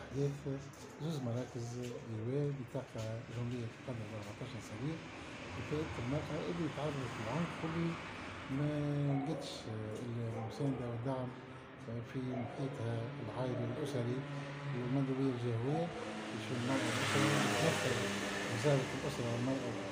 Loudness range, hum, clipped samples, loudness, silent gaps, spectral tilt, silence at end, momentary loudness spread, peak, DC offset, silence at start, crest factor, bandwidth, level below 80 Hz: 7 LU; none; under 0.1%; -39 LUFS; none; -5.5 dB/octave; 0 s; 11 LU; -20 dBFS; under 0.1%; 0 s; 18 dB; 15.5 kHz; -64 dBFS